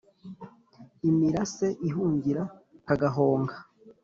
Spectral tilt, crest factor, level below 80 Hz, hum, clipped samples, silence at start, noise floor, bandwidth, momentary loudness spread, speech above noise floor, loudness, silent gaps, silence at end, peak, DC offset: -8 dB/octave; 18 dB; -60 dBFS; none; under 0.1%; 0.25 s; -54 dBFS; 7.6 kHz; 22 LU; 28 dB; -27 LUFS; none; 0.1 s; -10 dBFS; under 0.1%